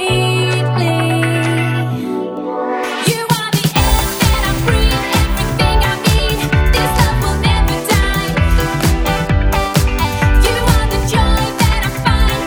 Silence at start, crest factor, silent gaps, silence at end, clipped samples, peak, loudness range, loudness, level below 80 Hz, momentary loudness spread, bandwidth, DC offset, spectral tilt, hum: 0 s; 14 dB; none; 0 s; under 0.1%; 0 dBFS; 2 LU; -14 LUFS; -18 dBFS; 3 LU; over 20 kHz; under 0.1%; -5 dB/octave; none